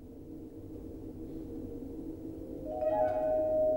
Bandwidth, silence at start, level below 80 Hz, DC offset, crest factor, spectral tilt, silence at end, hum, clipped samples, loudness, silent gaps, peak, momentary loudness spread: 16.5 kHz; 0 s; -52 dBFS; under 0.1%; 16 dB; -9 dB/octave; 0 s; none; under 0.1%; -35 LUFS; none; -20 dBFS; 16 LU